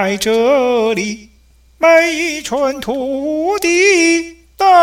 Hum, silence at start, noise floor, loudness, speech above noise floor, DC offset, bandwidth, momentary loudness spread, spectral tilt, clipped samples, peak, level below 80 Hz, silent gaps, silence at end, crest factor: none; 0 s; -42 dBFS; -13 LUFS; 29 dB; under 0.1%; 16.5 kHz; 10 LU; -3 dB/octave; under 0.1%; 0 dBFS; -48 dBFS; none; 0 s; 14 dB